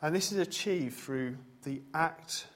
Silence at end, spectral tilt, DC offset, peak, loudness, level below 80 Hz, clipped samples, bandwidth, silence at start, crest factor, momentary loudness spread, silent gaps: 0.05 s; -4 dB/octave; under 0.1%; -14 dBFS; -34 LUFS; -72 dBFS; under 0.1%; 16 kHz; 0 s; 20 dB; 11 LU; none